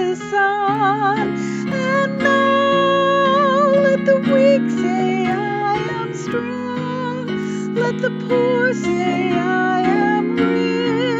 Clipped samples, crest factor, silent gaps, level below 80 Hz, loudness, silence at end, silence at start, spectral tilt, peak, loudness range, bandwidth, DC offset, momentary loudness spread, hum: under 0.1%; 14 dB; none; -56 dBFS; -17 LUFS; 0 s; 0 s; -6 dB/octave; -4 dBFS; 6 LU; 8 kHz; under 0.1%; 9 LU; none